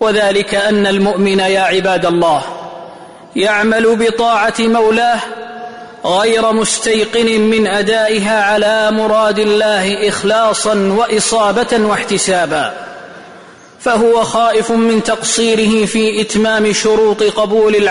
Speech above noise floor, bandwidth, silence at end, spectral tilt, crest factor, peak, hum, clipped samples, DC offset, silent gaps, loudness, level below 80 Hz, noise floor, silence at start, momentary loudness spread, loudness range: 26 dB; 11 kHz; 0 s; -3.5 dB/octave; 10 dB; -2 dBFS; none; under 0.1%; 0.2%; none; -12 LUFS; -46 dBFS; -37 dBFS; 0 s; 7 LU; 2 LU